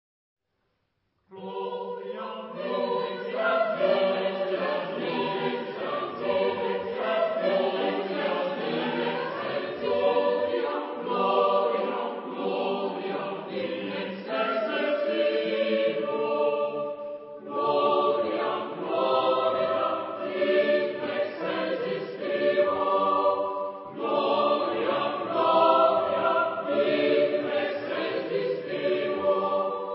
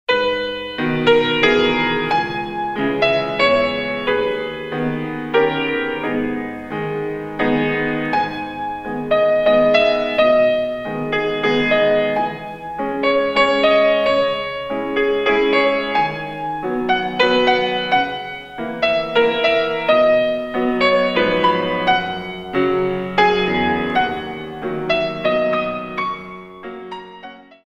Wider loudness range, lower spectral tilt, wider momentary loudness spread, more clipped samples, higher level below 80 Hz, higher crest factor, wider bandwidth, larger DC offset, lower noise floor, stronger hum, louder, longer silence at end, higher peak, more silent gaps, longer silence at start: about the same, 4 LU vs 4 LU; first, -9 dB/octave vs -6 dB/octave; about the same, 9 LU vs 11 LU; neither; second, -72 dBFS vs -46 dBFS; about the same, 18 dB vs 18 dB; second, 5.8 kHz vs 8 kHz; neither; first, -76 dBFS vs -39 dBFS; neither; second, -27 LUFS vs -18 LUFS; second, 0 s vs 0.25 s; second, -8 dBFS vs 0 dBFS; neither; first, 1.3 s vs 0.1 s